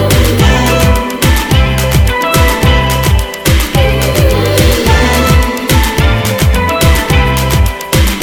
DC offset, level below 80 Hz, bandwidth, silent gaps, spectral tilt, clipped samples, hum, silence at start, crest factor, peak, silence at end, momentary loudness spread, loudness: under 0.1%; -14 dBFS; 19 kHz; none; -5 dB/octave; 0.2%; none; 0 s; 8 dB; 0 dBFS; 0 s; 3 LU; -10 LUFS